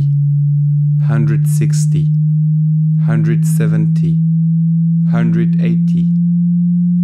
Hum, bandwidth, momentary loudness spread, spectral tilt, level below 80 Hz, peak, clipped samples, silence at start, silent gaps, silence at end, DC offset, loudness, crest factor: none; 12 kHz; 0 LU; -8.5 dB/octave; -54 dBFS; -4 dBFS; under 0.1%; 0 s; none; 0 s; under 0.1%; -13 LUFS; 8 dB